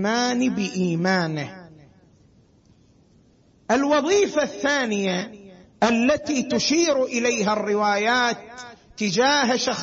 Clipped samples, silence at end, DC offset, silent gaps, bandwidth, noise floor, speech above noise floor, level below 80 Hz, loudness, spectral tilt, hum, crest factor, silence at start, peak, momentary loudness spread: under 0.1%; 0 s; under 0.1%; none; 8 kHz; -57 dBFS; 35 dB; -60 dBFS; -21 LUFS; -4 dB/octave; none; 16 dB; 0 s; -8 dBFS; 9 LU